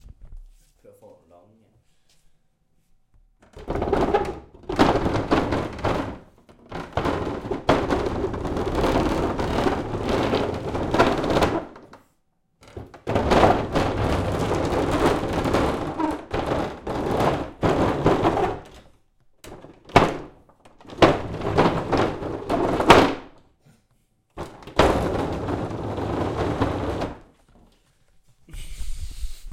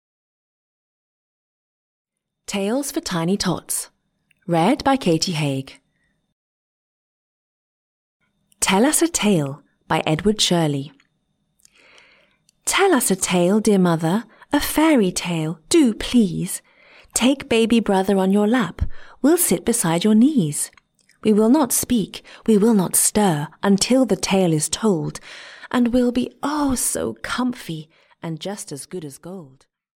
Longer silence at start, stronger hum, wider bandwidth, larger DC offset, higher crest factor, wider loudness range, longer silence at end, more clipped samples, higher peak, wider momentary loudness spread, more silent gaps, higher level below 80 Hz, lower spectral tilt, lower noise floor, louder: second, 0.05 s vs 2.5 s; neither; about the same, 17 kHz vs 17 kHz; neither; first, 24 dB vs 16 dB; about the same, 6 LU vs 8 LU; second, 0 s vs 0.55 s; neither; first, 0 dBFS vs -4 dBFS; first, 18 LU vs 15 LU; second, none vs 6.32-8.20 s; first, -38 dBFS vs -46 dBFS; first, -6 dB/octave vs -4.5 dB/octave; about the same, -67 dBFS vs -70 dBFS; second, -23 LUFS vs -19 LUFS